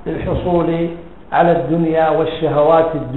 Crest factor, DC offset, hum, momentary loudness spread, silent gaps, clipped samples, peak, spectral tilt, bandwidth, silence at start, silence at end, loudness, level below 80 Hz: 14 dB; 1%; none; 8 LU; none; under 0.1%; 0 dBFS; -10 dB/octave; 4.2 kHz; 0 s; 0 s; -15 LUFS; -36 dBFS